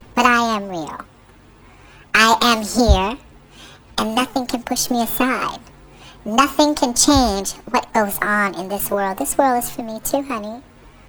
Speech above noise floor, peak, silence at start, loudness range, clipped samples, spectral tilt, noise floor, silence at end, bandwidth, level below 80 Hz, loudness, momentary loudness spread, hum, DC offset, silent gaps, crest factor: 29 dB; 0 dBFS; 0.15 s; 3 LU; under 0.1%; -3 dB/octave; -47 dBFS; 0.2 s; over 20 kHz; -32 dBFS; -18 LUFS; 14 LU; none; under 0.1%; none; 20 dB